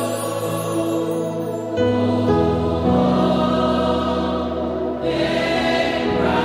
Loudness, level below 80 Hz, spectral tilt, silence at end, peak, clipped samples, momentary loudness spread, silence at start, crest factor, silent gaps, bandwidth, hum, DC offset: -20 LUFS; -38 dBFS; -6 dB/octave; 0 s; -6 dBFS; under 0.1%; 6 LU; 0 s; 14 dB; none; 16 kHz; none; under 0.1%